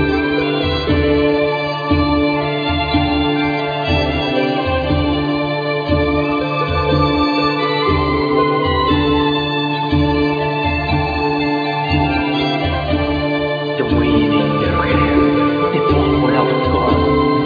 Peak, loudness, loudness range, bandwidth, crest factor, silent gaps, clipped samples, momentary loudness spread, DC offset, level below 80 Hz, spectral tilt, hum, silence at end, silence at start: -2 dBFS; -16 LUFS; 2 LU; 5 kHz; 12 dB; none; under 0.1%; 4 LU; under 0.1%; -30 dBFS; -8 dB/octave; none; 0 s; 0 s